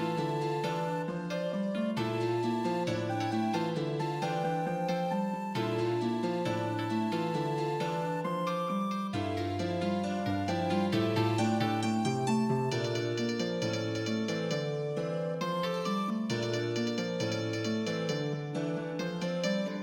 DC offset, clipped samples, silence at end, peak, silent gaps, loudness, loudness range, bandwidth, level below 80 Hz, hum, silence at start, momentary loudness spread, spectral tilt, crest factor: under 0.1%; under 0.1%; 0 s; -16 dBFS; none; -32 LUFS; 3 LU; 16.5 kHz; -70 dBFS; none; 0 s; 4 LU; -6 dB/octave; 14 dB